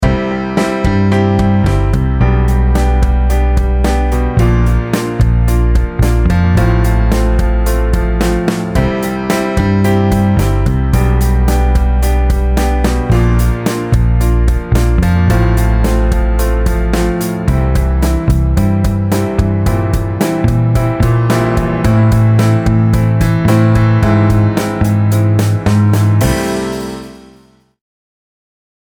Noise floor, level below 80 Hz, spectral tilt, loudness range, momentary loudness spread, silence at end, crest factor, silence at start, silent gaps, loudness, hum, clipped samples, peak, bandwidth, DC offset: -46 dBFS; -16 dBFS; -7 dB/octave; 3 LU; 4 LU; 1.75 s; 10 dB; 0 s; none; -13 LUFS; none; under 0.1%; 0 dBFS; over 20 kHz; under 0.1%